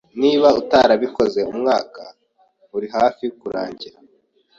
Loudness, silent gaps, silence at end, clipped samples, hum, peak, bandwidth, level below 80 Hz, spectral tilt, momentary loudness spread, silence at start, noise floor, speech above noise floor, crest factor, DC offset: -18 LUFS; none; 0.7 s; under 0.1%; none; -2 dBFS; 7.6 kHz; -56 dBFS; -5 dB/octave; 19 LU; 0.15 s; -59 dBFS; 42 dB; 18 dB; under 0.1%